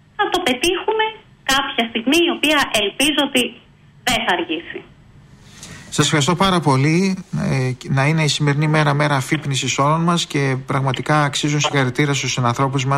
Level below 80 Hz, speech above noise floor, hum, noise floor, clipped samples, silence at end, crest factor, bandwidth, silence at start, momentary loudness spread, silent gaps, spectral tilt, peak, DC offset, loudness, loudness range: -46 dBFS; 28 dB; none; -45 dBFS; under 0.1%; 0 s; 14 dB; 16 kHz; 0.2 s; 6 LU; none; -4.5 dB/octave; -4 dBFS; under 0.1%; -18 LUFS; 3 LU